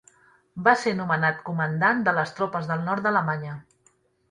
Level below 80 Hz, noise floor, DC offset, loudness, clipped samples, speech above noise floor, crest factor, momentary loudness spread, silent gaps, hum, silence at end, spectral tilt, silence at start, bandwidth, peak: -66 dBFS; -64 dBFS; under 0.1%; -24 LUFS; under 0.1%; 40 dB; 22 dB; 10 LU; none; none; 0.7 s; -6.5 dB/octave; 0.55 s; 11 kHz; -4 dBFS